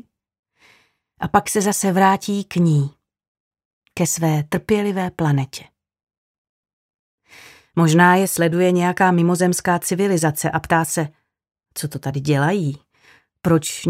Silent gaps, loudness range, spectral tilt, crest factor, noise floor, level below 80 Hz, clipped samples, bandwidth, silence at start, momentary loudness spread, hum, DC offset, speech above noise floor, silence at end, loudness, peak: 3.28-3.51 s, 3.65-3.82 s, 6.17-6.63 s, 6.73-7.18 s; 6 LU; -5.5 dB/octave; 20 dB; -58 dBFS; -54 dBFS; under 0.1%; 16 kHz; 1.2 s; 12 LU; none; under 0.1%; 41 dB; 0 s; -19 LUFS; 0 dBFS